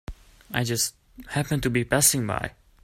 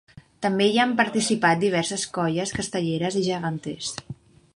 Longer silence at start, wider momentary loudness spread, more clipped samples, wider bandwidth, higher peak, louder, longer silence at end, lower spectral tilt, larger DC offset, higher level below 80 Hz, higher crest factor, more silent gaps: second, 0.1 s vs 0.4 s; about the same, 12 LU vs 11 LU; neither; first, 16 kHz vs 11.5 kHz; about the same, -6 dBFS vs -6 dBFS; about the same, -24 LUFS vs -24 LUFS; about the same, 0.35 s vs 0.45 s; about the same, -3.5 dB/octave vs -4 dB/octave; neither; first, -46 dBFS vs -58 dBFS; about the same, 22 dB vs 20 dB; neither